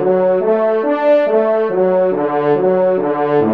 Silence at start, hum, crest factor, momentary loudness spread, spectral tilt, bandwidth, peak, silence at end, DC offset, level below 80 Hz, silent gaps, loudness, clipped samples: 0 s; none; 10 dB; 2 LU; -9.5 dB/octave; 5 kHz; -2 dBFS; 0 s; 0.3%; -66 dBFS; none; -14 LUFS; under 0.1%